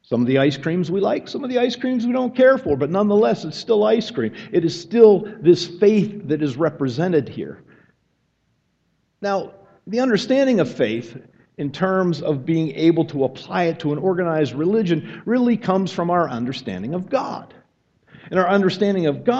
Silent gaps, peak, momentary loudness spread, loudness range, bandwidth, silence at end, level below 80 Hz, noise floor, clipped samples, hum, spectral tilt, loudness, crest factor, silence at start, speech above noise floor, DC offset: none; 0 dBFS; 10 LU; 6 LU; 8 kHz; 0 s; -60 dBFS; -67 dBFS; under 0.1%; none; -7 dB/octave; -20 LUFS; 20 dB; 0.1 s; 48 dB; under 0.1%